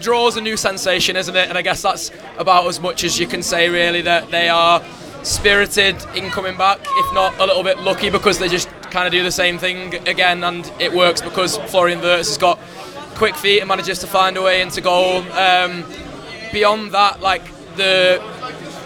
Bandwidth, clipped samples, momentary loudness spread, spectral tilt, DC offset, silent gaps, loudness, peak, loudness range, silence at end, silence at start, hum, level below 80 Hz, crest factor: 20 kHz; under 0.1%; 10 LU; -2.5 dB/octave; under 0.1%; none; -16 LUFS; 0 dBFS; 2 LU; 0 s; 0 s; none; -44 dBFS; 16 dB